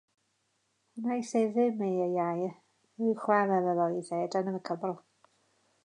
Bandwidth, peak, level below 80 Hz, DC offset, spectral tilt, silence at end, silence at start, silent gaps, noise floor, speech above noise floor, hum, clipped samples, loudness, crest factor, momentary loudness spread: 10.5 kHz; -12 dBFS; -86 dBFS; under 0.1%; -7 dB/octave; 0.85 s; 0.95 s; none; -76 dBFS; 46 dB; none; under 0.1%; -31 LUFS; 20 dB; 10 LU